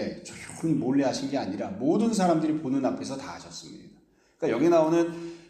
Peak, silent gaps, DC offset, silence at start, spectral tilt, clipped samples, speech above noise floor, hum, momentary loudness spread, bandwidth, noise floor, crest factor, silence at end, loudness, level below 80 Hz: -10 dBFS; none; under 0.1%; 0 s; -6 dB/octave; under 0.1%; 34 dB; none; 18 LU; 12 kHz; -59 dBFS; 18 dB; 0.1 s; -26 LUFS; -66 dBFS